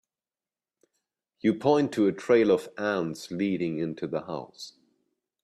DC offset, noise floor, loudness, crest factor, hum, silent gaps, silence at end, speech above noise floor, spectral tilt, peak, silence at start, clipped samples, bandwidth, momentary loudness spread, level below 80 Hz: under 0.1%; under -90 dBFS; -27 LUFS; 20 dB; none; none; 0.75 s; over 64 dB; -6.5 dB/octave; -8 dBFS; 1.45 s; under 0.1%; 13 kHz; 15 LU; -70 dBFS